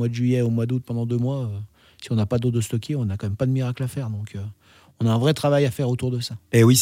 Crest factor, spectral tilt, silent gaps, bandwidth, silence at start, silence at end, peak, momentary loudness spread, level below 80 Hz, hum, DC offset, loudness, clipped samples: 16 dB; -6 dB/octave; none; 16 kHz; 0 s; 0 s; -6 dBFS; 12 LU; -58 dBFS; none; under 0.1%; -23 LUFS; under 0.1%